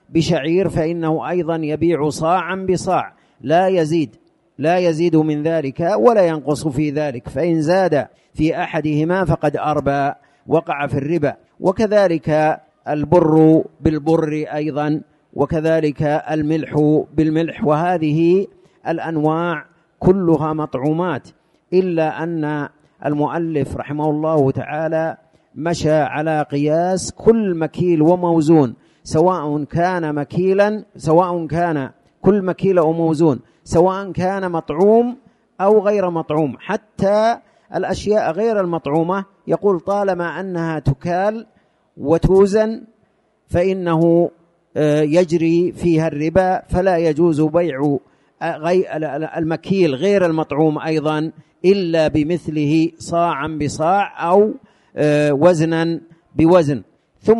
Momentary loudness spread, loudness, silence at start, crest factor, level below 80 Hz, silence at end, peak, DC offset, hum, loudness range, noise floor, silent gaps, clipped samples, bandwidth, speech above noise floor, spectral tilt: 9 LU; -17 LUFS; 0.1 s; 16 dB; -44 dBFS; 0 s; 0 dBFS; under 0.1%; none; 3 LU; -60 dBFS; none; under 0.1%; 11.5 kHz; 44 dB; -7 dB/octave